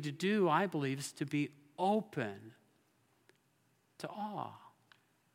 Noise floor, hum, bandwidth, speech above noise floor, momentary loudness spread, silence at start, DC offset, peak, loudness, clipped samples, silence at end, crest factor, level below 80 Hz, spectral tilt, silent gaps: -75 dBFS; none; 16.5 kHz; 39 dB; 16 LU; 0 s; under 0.1%; -16 dBFS; -36 LUFS; under 0.1%; 0.65 s; 22 dB; -90 dBFS; -5.5 dB/octave; none